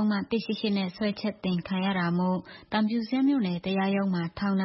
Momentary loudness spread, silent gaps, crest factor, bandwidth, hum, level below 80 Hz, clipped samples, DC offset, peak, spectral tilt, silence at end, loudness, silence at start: 5 LU; none; 16 dB; 5.8 kHz; none; -62 dBFS; under 0.1%; under 0.1%; -12 dBFS; -10.5 dB/octave; 0 s; -28 LUFS; 0 s